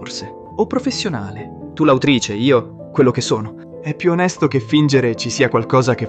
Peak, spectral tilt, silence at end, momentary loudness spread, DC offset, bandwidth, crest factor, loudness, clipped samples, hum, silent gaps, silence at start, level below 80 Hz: 0 dBFS; -5.5 dB/octave; 0 s; 15 LU; under 0.1%; 9 kHz; 16 dB; -17 LUFS; under 0.1%; none; none; 0 s; -52 dBFS